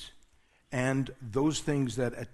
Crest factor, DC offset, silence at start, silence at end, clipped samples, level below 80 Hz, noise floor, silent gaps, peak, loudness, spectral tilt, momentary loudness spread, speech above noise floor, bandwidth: 18 dB; under 0.1%; 0 s; 0.05 s; under 0.1%; -54 dBFS; -64 dBFS; none; -14 dBFS; -31 LUFS; -5.5 dB/octave; 6 LU; 34 dB; 12.5 kHz